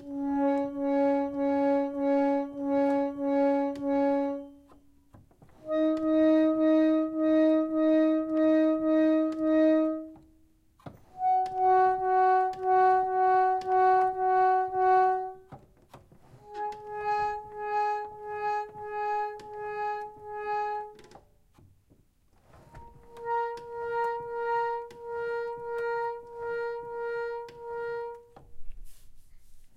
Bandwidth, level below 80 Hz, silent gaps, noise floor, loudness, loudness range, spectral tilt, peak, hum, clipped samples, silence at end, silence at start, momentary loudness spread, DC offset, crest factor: 7 kHz; -58 dBFS; none; -64 dBFS; -27 LUFS; 12 LU; -7 dB/octave; -14 dBFS; none; under 0.1%; 0.1 s; 0 s; 14 LU; under 0.1%; 14 dB